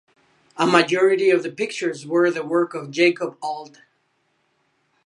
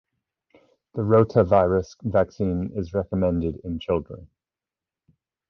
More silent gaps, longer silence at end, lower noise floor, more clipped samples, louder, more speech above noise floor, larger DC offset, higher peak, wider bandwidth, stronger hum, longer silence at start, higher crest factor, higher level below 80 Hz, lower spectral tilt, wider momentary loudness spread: neither; first, 1.4 s vs 1.25 s; second, -68 dBFS vs under -90 dBFS; neither; first, -20 LUFS vs -23 LUFS; second, 48 dB vs over 68 dB; neither; first, 0 dBFS vs -6 dBFS; first, 11 kHz vs 6.6 kHz; neither; second, 0.55 s vs 0.95 s; about the same, 22 dB vs 20 dB; second, -74 dBFS vs -42 dBFS; second, -4.5 dB/octave vs -9 dB/octave; about the same, 13 LU vs 12 LU